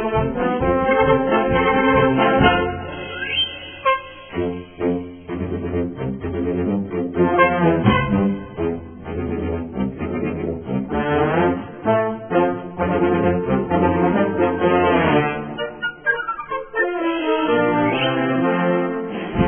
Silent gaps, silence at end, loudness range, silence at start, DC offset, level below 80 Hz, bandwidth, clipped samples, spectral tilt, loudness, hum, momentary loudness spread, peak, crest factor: none; 0 s; 6 LU; 0 s; under 0.1%; -40 dBFS; 3.5 kHz; under 0.1%; -10.5 dB/octave; -20 LUFS; none; 10 LU; -2 dBFS; 18 dB